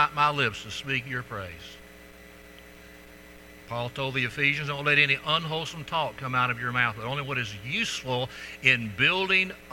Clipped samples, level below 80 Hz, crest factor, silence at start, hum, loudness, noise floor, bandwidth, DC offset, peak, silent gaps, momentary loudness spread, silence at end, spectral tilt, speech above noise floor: under 0.1%; -56 dBFS; 24 dB; 0 s; none; -26 LUFS; -49 dBFS; 19 kHz; under 0.1%; -4 dBFS; none; 13 LU; 0 s; -4 dB/octave; 21 dB